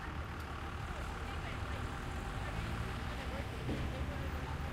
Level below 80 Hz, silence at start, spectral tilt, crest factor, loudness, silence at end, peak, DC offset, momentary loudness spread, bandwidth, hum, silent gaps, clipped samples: -44 dBFS; 0 s; -6 dB/octave; 14 dB; -42 LUFS; 0 s; -26 dBFS; under 0.1%; 3 LU; 16 kHz; none; none; under 0.1%